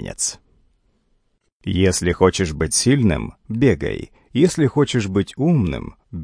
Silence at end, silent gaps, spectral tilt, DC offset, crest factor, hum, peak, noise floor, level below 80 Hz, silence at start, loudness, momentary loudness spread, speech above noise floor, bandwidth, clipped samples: 0 s; 1.52-1.60 s; -5 dB/octave; under 0.1%; 20 dB; none; 0 dBFS; -65 dBFS; -38 dBFS; 0 s; -19 LUFS; 11 LU; 47 dB; 10.5 kHz; under 0.1%